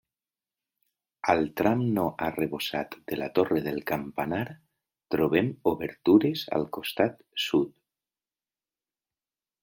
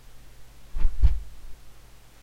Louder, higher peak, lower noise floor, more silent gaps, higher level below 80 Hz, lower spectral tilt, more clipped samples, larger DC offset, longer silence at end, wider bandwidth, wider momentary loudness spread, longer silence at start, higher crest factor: about the same, -28 LUFS vs -29 LUFS; about the same, -8 dBFS vs -8 dBFS; first, under -90 dBFS vs -48 dBFS; neither; second, -64 dBFS vs -28 dBFS; about the same, -6.5 dB/octave vs -6.5 dB/octave; neither; neither; first, 1.95 s vs 0.5 s; first, 17 kHz vs 4.6 kHz; second, 10 LU vs 26 LU; first, 1.25 s vs 0.15 s; first, 22 dB vs 16 dB